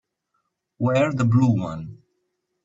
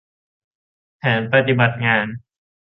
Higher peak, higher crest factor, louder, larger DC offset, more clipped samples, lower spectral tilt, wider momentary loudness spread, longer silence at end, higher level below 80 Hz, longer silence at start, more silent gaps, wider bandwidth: second, -6 dBFS vs -2 dBFS; about the same, 16 dB vs 20 dB; second, -21 LUFS vs -18 LUFS; neither; neither; second, -8 dB/octave vs -9.5 dB/octave; first, 16 LU vs 11 LU; first, 0.7 s vs 0.45 s; about the same, -58 dBFS vs -58 dBFS; second, 0.8 s vs 1.05 s; neither; first, 7.8 kHz vs 5.2 kHz